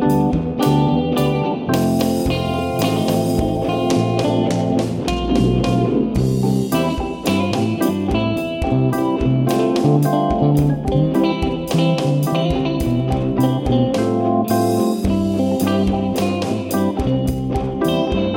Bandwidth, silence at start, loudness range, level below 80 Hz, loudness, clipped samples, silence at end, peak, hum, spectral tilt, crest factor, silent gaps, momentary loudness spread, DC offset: 17 kHz; 0 s; 2 LU; -34 dBFS; -18 LUFS; under 0.1%; 0 s; -2 dBFS; none; -7 dB/octave; 14 dB; none; 4 LU; under 0.1%